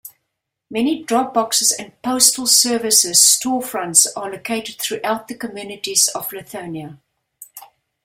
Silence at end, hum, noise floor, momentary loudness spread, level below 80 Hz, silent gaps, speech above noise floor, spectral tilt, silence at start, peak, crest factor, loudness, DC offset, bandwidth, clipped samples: 0.4 s; none; -77 dBFS; 18 LU; -64 dBFS; none; 59 dB; -0.5 dB/octave; 0.05 s; 0 dBFS; 20 dB; -15 LUFS; under 0.1%; 16.5 kHz; under 0.1%